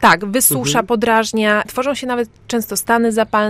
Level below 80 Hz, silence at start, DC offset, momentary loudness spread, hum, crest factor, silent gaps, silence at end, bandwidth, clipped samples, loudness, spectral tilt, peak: -48 dBFS; 0 s; under 0.1%; 9 LU; none; 16 dB; none; 0 s; 16 kHz; under 0.1%; -16 LUFS; -3 dB/octave; 0 dBFS